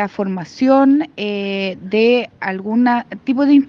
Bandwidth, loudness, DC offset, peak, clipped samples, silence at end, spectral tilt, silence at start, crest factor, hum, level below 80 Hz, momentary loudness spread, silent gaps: 6.6 kHz; -17 LUFS; under 0.1%; -2 dBFS; under 0.1%; 0 s; -7 dB/octave; 0 s; 14 dB; none; -62 dBFS; 10 LU; none